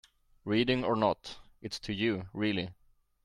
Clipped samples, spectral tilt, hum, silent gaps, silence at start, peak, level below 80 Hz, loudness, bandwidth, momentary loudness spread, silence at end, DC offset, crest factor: under 0.1%; -6 dB/octave; none; none; 0.45 s; -14 dBFS; -60 dBFS; -32 LUFS; 12 kHz; 16 LU; 0.5 s; under 0.1%; 18 dB